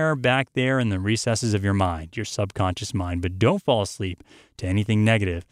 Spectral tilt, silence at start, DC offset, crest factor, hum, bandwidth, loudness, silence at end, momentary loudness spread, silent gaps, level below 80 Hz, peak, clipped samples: -5.5 dB/octave; 0 s; under 0.1%; 16 dB; none; 12.5 kHz; -23 LUFS; 0.1 s; 10 LU; none; -46 dBFS; -6 dBFS; under 0.1%